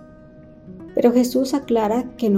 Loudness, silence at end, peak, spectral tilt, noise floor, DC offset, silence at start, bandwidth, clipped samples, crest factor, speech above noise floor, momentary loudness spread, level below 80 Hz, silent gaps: -20 LUFS; 0 s; -4 dBFS; -6 dB/octave; -44 dBFS; under 0.1%; 0.65 s; 16.5 kHz; under 0.1%; 16 dB; 26 dB; 8 LU; -52 dBFS; none